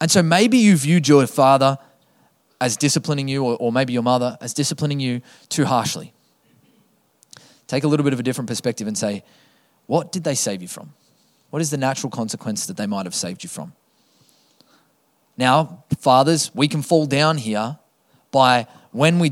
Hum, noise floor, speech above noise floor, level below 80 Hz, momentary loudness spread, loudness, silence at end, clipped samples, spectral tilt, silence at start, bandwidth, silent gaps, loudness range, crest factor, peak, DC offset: none; -63 dBFS; 44 dB; -64 dBFS; 14 LU; -19 LUFS; 0 s; under 0.1%; -4.5 dB/octave; 0 s; 16 kHz; none; 7 LU; 20 dB; 0 dBFS; under 0.1%